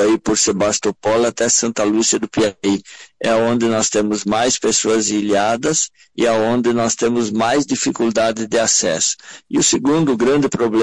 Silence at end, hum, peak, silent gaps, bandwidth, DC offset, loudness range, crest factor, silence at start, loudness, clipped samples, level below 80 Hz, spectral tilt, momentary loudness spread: 0 s; none; -2 dBFS; none; 11.5 kHz; under 0.1%; 1 LU; 14 dB; 0 s; -16 LUFS; under 0.1%; -52 dBFS; -3 dB/octave; 4 LU